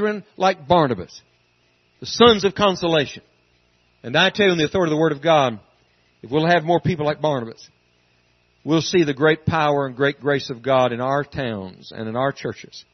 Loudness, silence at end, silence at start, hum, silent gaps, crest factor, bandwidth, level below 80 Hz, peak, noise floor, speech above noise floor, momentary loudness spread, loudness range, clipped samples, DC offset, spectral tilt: -19 LUFS; 0.15 s; 0 s; 60 Hz at -55 dBFS; none; 20 dB; 6.4 kHz; -54 dBFS; 0 dBFS; -62 dBFS; 42 dB; 15 LU; 3 LU; under 0.1%; under 0.1%; -5.5 dB/octave